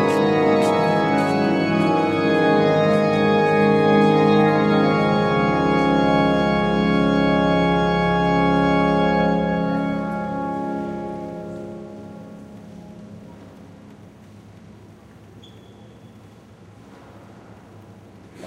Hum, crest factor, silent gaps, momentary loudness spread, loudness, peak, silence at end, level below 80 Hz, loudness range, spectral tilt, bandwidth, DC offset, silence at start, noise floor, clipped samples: none; 16 dB; none; 19 LU; -18 LUFS; -4 dBFS; 0 s; -44 dBFS; 15 LU; -7 dB/octave; 12 kHz; under 0.1%; 0 s; -45 dBFS; under 0.1%